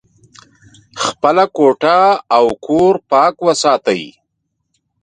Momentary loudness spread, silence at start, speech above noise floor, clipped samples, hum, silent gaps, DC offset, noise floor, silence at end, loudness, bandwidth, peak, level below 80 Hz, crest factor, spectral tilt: 9 LU; 0.95 s; 59 dB; under 0.1%; none; none; under 0.1%; -71 dBFS; 0.95 s; -13 LUFS; 10 kHz; 0 dBFS; -54 dBFS; 14 dB; -4 dB/octave